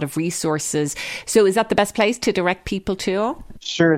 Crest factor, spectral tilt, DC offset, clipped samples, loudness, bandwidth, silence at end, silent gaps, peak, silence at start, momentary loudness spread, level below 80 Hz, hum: 18 dB; -4 dB/octave; under 0.1%; under 0.1%; -20 LUFS; 16.5 kHz; 0 s; none; -2 dBFS; 0 s; 9 LU; -46 dBFS; none